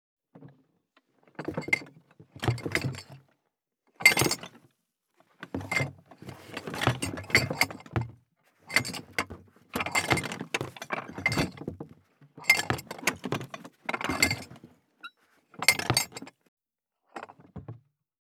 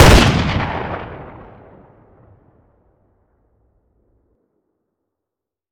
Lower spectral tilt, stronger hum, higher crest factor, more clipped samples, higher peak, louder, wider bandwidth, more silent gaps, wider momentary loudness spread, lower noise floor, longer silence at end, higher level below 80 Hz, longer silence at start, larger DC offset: second, -3 dB/octave vs -5 dB/octave; neither; first, 32 dB vs 18 dB; neither; about the same, -2 dBFS vs 0 dBFS; second, -28 LUFS vs -16 LUFS; first, 19.5 kHz vs 17 kHz; first, 16.48-16.57 s vs none; second, 23 LU vs 28 LU; about the same, -83 dBFS vs -84 dBFS; second, 0.55 s vs 4.4 s; second, -60 dBFS vs -24 dBFS; first, 0.35 s vs 0 s; neither